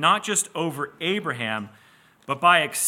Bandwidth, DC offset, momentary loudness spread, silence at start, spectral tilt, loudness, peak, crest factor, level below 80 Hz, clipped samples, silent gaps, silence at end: 17 kHz; under 0.1%; 14 LU; 0 s; -2 dB/octave; -23 LUFS; -4 dBFS; 20 dB; -76 dBFS; under 0.1%; none; 0 s